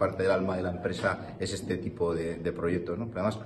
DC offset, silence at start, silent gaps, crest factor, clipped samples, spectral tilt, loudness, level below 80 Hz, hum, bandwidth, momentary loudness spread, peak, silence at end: under 0.1%; 0 s; none; 16 dB; under 0.1%; -6 dB/octave; -31 LUFS; -54 dBFS; none; 12.5 kHz; 7 LU; -14 dBFS; 0 s